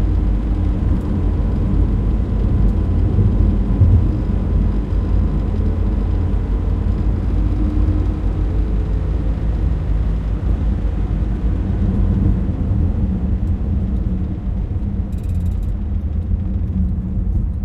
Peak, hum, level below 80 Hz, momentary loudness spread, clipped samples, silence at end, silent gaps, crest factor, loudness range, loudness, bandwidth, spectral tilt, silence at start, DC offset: -4 dBFS; none; -18 dBFS; 5 LU; under 0.1%; 0 s; none; 14 dB; 4 LU; -19 LUFS; 4 kHz; -10.5 dB/octave; 0 s; under 0.1%